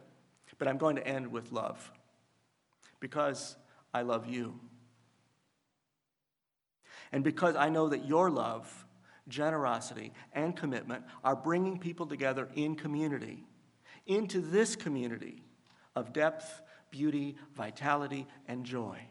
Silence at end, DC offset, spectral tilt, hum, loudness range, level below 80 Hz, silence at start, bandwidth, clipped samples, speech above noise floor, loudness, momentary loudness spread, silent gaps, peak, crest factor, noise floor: 0 s; under 0.1%; -5.5 dB/octave; none; 7 LU; -84 dBFS; 0.6 s; 11.5 kHz; under 0.1%; 54 dB; -34 LUFS; 16 LU; none; -12 dBFS; 24 dB; -88 dBFS